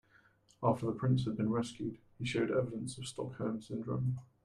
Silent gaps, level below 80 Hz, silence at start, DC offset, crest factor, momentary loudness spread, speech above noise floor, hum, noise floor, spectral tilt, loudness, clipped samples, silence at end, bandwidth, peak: none; -66 dBFS; 0.6 s; under 0.1%; 20 dB; 9 LU; 32 dB; none; -67 dBFS; -7 dB/octave; -36 LUFS; under 0.1%; 0.2 s; 11 kHz; -16 dBFS